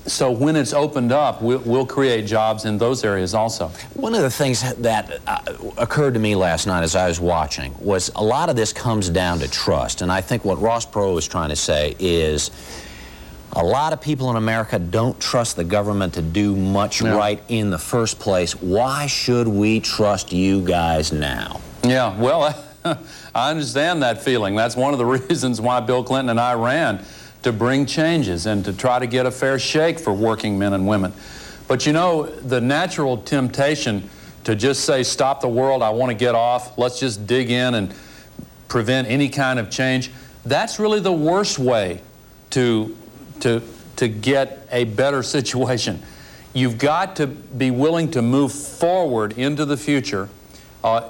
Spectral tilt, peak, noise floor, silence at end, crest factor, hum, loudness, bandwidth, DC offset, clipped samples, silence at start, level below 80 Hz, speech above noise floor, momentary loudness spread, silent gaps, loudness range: -5 dB/octave; -8 dBFS; -40 dBFS; 0 s; 12 dB; none; -20 LUFS; 17 kHz; under 0.1%; under 0.1%; 0 s; -44 dBFS; 21 dB; 7 LU; none; 2 LU